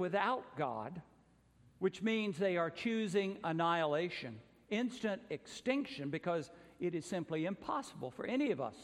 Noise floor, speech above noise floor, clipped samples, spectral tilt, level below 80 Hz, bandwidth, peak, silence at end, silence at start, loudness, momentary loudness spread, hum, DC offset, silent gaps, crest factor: -68 dBFS; 30 dB; under 0.1%; -5.5 dB/octave; -76 dBFS; 12.5 kHz; -20 dBFS; 0 s; 0 s; -38 LUFS; 10 LU; none; under 0.1%; none; 18 dB